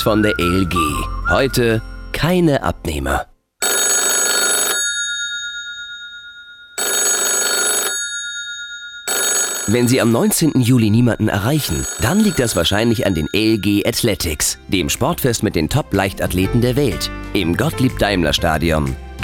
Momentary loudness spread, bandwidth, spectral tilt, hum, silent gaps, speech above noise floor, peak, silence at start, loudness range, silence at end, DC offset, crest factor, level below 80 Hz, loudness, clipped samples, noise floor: 10 LU; 17.5 kHz; -3.5 dB/octave; none; none; 22 dB; -2 dBFS; 0 s; 3 LU; 0 s; under 0.1%; 16 dB; -32 dBFS; -16 LUFS; under 0.1%; -39 dBFS